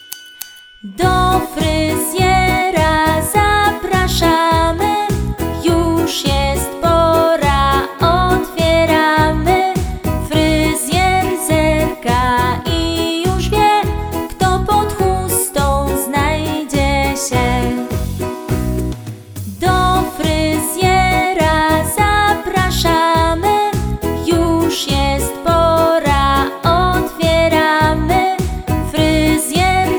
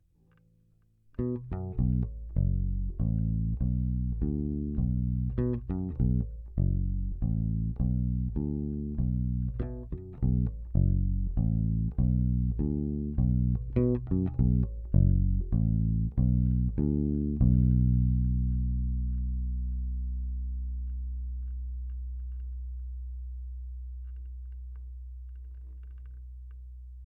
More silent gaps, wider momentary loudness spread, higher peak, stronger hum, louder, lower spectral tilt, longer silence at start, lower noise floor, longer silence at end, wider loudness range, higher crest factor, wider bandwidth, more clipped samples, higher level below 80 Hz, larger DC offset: neither; second, 7 LU vs 16 LU; first, 0 dBFS vs -12 dBFS; neither; first, -14 LUFS vs -30 LUFS; second, -4.5 dB/octave vs -14.5 dB/octave; second, 0 s vs 1.2 s; second, -34 dBFS vs -65 dBFS; about the same, 0 s vs 0.05 s; second, 3 LU vs 13 LU; about the same, 14 dB vs 18 dB; first, over 20 kHz vs 2 kHz; neither; first, -24 dBFS vs -32 dBFS; neither